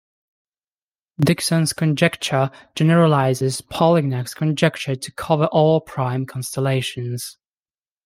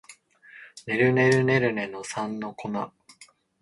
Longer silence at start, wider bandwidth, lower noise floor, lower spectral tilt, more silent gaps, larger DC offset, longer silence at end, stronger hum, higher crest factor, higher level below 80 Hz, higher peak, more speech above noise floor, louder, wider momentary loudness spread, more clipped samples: first, 1.2 s vs 0.1 s; first, 16 kHz vs 11.5 kHz; first, under -90 dBFS vs -55 dBFS; about the same, -5.5 dB/octave vs -6 dB/octave; neither; neither; first, 0.75 s vs 0.4 s; neither; about the same, 18 dB vs 18 dB; first, -56 dBFS vs -64 dBFS; first, -2 dBFS vs -8 dBFS; first, over 71 dB vs 31 dB; first, -19 LUFS vs -25 LUFS; second, 10 LU vs 16 LU; neither